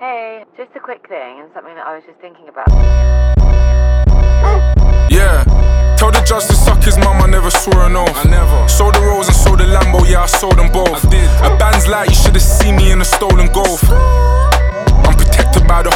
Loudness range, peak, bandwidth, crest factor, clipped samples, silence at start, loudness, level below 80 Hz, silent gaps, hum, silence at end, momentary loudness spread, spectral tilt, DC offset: 3 LU; 0 dBFS; 16.5 kHz; 8 dB; under 0.1%; 0 s; -11 LUFS; -10 dBFS; none; none; 0 s; 16 LU; -5 dB/octave; under 0.1%